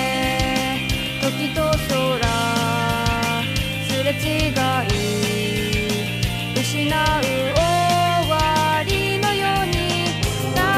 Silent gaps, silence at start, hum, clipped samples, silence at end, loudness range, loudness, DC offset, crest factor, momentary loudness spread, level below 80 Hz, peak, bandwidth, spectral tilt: none; 0 s; none; under 0.1%; 0 s; 2 LU; -20 LUFS; under 0.1%; 16 dB; 4 LU; -34 dBFS; -4 dBFS; 15.5 kHz; -4.5 dB/octave